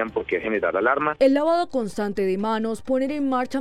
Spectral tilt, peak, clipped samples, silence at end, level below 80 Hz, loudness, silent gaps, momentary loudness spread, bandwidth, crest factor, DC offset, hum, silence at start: -6 dB/octave; -6 dBFS; under 0.1%; 0 s; -54 dBFS; -23 LUFS; none; 7 LU; 13 kHz; 16 dB; under 0.1%; none; 0 s